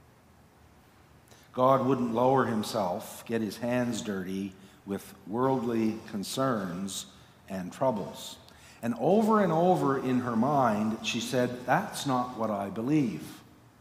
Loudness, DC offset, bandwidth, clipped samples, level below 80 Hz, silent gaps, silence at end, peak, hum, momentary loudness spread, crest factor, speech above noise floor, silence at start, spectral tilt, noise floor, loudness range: -29 LUFS; under 0.1%; 16 kHz; under 0.1%; -66 dBFS; none; 0.4 s; -10 dBFS; none; 14 LU; 20 dB; 30 dB; 1.55 s; -5.5 dB/octave; -58 dBFS; 5 LU